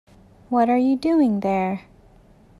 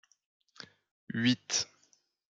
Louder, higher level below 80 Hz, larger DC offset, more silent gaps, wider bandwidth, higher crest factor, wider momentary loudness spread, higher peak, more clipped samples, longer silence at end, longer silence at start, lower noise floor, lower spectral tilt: first, -20 LUFS vs -32 LUFS; first, -56 dBFS vs -78 dBFS; neither; second, none vs 0.91-1.07 s; first, 11 kHz vs 9.2 kHz; second, 14 dB vs 22 dB; second, 8 LU vs 22 LU; first, -8 dBFS vs -14 dBFS; neither; about the same, 0.8 s vs 0.7 s; about the same, 0.5 s vs 0.6 s; second, -51 dBFS vs -71 dBFS; first, -8 dB/octave vs -3 dB/octave